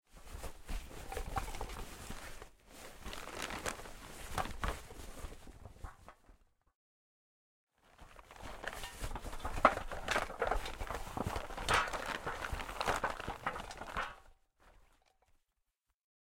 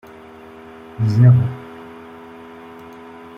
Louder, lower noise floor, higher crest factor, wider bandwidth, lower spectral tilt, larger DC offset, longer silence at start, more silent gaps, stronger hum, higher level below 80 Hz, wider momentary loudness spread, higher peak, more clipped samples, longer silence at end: second, -40 LUFS vs -15 LUFS; first, -84 dBFS vs -40 dBFS; first, 32 dB vs 18 dB; first, 16.5 kHz vs 5.8 kHz; second, -3.5 dB/octave vs -9.5 dB/octave; neither; second, 0.15 s vs 1 s; first, 6.75-7.67 s vs none; neither; about the same, -50 dBFS vs -54 dBFS; second, 21 LU vs 27 LU; second, -10 dBFS vs -2 dBFS; neither; about the same, 1.45 s vs 1.55 s